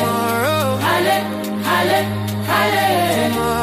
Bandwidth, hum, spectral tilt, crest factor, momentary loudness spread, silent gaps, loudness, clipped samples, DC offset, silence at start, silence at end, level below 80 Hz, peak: 15.5 kHz; none; -4.5 dB/octave; 14 dB; 6 LU; none; -17 LUFS; under 0.1%; under 0.1%; 0 s; 0 s; -46 dBFS; -4 dBFS